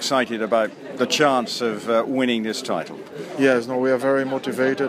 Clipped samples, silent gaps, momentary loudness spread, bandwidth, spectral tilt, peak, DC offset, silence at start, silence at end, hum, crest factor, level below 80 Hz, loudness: under 0.1%; none; 9 LU; 15.5 kHz; -4 dB/octave; -4 dBFS; under 0.1%; 0 s; 0 s; none; 18 dB; -74 dBFS; -21 LUFS